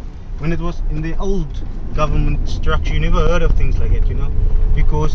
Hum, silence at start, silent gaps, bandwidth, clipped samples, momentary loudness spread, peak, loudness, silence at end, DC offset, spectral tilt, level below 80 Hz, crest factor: none; 0 s; none; 6.4 kHz; under 0.1%; 7 LU; 0 dBFS; -21 LUFS; 0 s; under 0.1%; -7 dB/octave; -16 dBFS; 12 dB